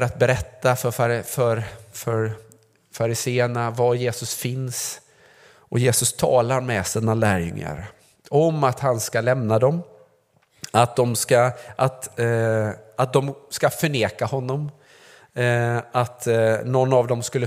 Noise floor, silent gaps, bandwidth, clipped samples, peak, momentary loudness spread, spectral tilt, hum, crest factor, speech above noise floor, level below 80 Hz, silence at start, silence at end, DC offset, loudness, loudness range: -62 dBFS; none; 16 kHz; under 0.1%; 0 dBFS; 10 LU; -5 dB/octave; none; 22 dB; 41 dB; -52 dBFS; 0 s; 0 s; under 0.1%; -22 LUFS; 3 LU